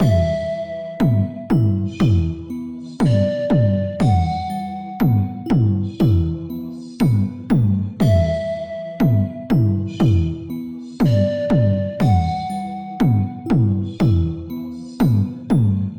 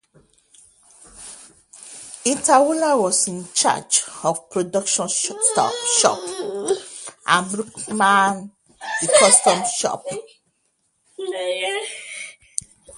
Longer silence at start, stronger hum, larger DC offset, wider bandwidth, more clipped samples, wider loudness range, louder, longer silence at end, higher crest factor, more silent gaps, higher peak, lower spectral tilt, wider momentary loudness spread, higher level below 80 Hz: second, 0 s vs 1.15 s; neither; neither; first, 17 kHz vs 14 kHz; neither; second, 1 LU vs 4 LU; about the same, -19 LUFS vs -19 LUFS; about the same, 0 s vs 0 s; second, 12 dB vs 22 dB; neither; second, -6 dBFS vs 0 dBFS; first, -9 dB/octave vs -1.5 dB/octave; second, 11 LU vs 18 LU; first, -36 dBFS vs -66 dBFS